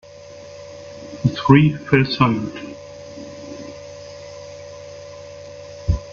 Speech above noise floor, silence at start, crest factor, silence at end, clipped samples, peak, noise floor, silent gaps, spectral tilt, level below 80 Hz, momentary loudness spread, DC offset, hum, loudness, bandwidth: 23 dB; 0.3 s; 22 dB; 0 s; under 0.1%; 0 dBFS; -39 dBFS; none; -7 dB/octave; -38 dBFS; 23 LU; under 0.1%; 50 Hz at -55 dBFS; -18 LUFS; 7.4 kHz